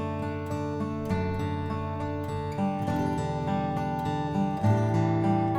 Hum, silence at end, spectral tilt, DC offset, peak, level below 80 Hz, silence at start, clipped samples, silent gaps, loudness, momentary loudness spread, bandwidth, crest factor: none; 0 s; -8 dB/octave; under 0.1%; -12 dBFS; -50 dBFS; 0 s; under 0.1%; none; -29 LUFS; 7 LU; 12.5 kHz; 16 dB